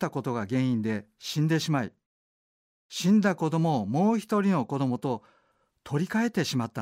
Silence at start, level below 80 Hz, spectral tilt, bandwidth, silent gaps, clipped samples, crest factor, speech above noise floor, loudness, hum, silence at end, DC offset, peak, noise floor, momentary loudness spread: 0 s; -70 dBFS; -6 dB/octave; 16 kHz; 2.06-2.90 s; under 0.1%; 14 dB; 43 dB; -27 LUFS; none; 0 s; under 0.1%; -12 dBFS; -69 dBFS; 10 LU